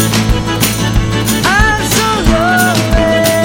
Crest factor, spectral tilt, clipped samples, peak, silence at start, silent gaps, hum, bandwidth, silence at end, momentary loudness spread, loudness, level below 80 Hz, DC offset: 10 dB; -4 dB/octave; under 0.1%; 0 dBFS; 0 s; none; none; 17 kHz; 0 s; 4 LU; -11 LUFS; -20 dBFS; under 0.1%